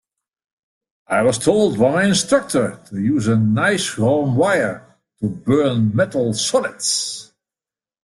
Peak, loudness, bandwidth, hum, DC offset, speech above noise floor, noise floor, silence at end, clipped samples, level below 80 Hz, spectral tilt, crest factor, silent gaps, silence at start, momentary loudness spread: -2 dBFS; -18 LUFS; 12.5 kHz; none; under 0.1%; over 73 dB; under -90 dBFS; 0.8 s; under 0.1%; -54 dBFS; -4.5 dB/octave; 16 dB; none; 1.1 s; 8 LU